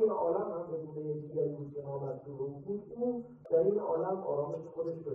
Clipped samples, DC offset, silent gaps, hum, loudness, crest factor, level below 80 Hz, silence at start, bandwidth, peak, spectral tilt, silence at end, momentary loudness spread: under 0.1%; under 0.1%; none; none; -35 LUFS; 16 dB; -74 dBFS; 0 s; 2.5 kHz; -18 dBFS; -11.5 dB/octave; 0 s; 11 LU